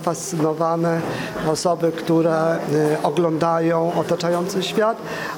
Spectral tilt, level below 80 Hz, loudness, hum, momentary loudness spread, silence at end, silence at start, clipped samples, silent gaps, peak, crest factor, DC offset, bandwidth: -5.5 dB/octave; -56 dBFS; -20 LUFS; none; 4 LU; 0 s; 0 s; under 0.1%; none; -4 dBFS; 16 dB; under 0.1%; 18 kHz